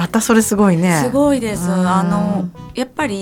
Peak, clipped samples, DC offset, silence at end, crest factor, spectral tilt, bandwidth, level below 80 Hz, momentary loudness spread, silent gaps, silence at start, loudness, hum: 0 dBFS; under 0.1%; under 0.1%; 0 s; 14 dB; -5.5 dB/octave; 17 kHz; -44 dBFS; 9 LU; none; 0 s; -16 LUFS; none